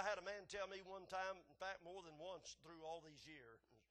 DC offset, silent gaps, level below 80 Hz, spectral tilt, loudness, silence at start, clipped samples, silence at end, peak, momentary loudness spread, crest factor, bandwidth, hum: under 0.1%; none; -80 dBFS; -2.5 dB/octave; -52 LUFS; 0 s; under 0.1%; 0.1 s; -32 dBFS; 12 LU; 22 dB; 12 kHz; none